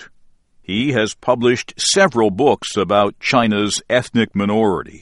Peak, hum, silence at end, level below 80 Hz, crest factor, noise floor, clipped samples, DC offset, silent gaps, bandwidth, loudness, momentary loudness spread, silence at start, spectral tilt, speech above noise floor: 0 dBFS; none; 0.05 s; -50 dBFS; 16 dB; -50 dBFS; under 0.1%; under 0.1%; none; 11.5 kHz; -17 LUFS; 5 LU; 0 s; -4 dB/octave; 33 dB